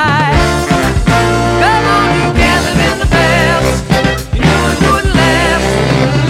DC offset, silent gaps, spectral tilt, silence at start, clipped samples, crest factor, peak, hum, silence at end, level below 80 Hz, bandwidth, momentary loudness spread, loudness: under 0.1%; none; -5 dB/octave; 0 s; under 0.1%; 10 dB; 0 dBFS; none; 0 s; -20 dBFS; 16.5 kHz; 3 LU; -10 LUFS